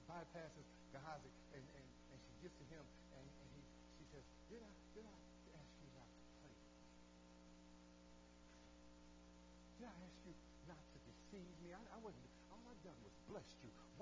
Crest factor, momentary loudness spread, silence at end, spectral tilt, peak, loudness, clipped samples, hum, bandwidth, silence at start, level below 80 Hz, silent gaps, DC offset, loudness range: 20 dB; 9 LU; 0 s; -5.5 dB/octave; -40 dBFS; -62 LUFS; under 0.1%; 60 Hz at -70 dBFS; 8 kHz; 0 s; -72 dBFS; none; under 0.1%; 6 LU